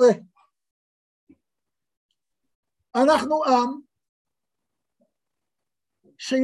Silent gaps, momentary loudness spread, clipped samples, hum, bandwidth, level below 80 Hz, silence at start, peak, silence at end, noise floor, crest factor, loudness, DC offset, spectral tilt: 0.71-1.27 s, 1.97-2.09 s, 2.55-2.63 s, 4.09-4.25 s; 14 LU; under 0.1%; none; 12 kHz; -70 dBFS; 0 s; -6 dBFS; 0 s; -87 dBFS; 20 dB; -22 LUFS; under 0.1%; -4.5 dB/octave